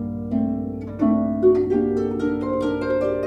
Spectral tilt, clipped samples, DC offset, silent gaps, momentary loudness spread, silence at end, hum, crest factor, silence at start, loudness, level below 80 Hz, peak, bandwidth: -9 dB/octave; under 0.1%; under 0.1%; none; 7 LU; 0 s; none; 16 dB; 0 s; -22 LUFS; -46 dBFS; -6 dBFS; 7.4 kHz